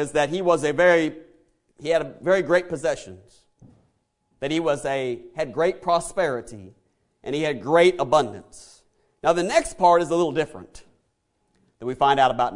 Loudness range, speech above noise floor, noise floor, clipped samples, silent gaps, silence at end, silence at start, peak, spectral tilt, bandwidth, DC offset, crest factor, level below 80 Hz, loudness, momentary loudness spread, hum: 5 LU; 49 dB; -71 dBFS; under 0.1%; none; 0 s; 0 s; -4 dBFS; -4.5 dB/octave; 11 kHz; under 0.1%; 20 dB; -54 dBFS; -22 LUFS; 15 LU; none